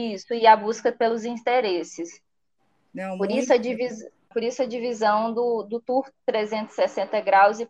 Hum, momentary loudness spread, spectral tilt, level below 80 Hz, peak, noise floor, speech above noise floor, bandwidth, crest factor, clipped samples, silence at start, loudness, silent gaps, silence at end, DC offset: none; 15 LU; -4 dB/octave; -74 dBFS; -2 dBFS; -73 dBFS; 51 dB; 9.2 kHz; 20 dB; under 0.1%; 0 s; -23 LUFS; none; 0.05 s; under 0.1%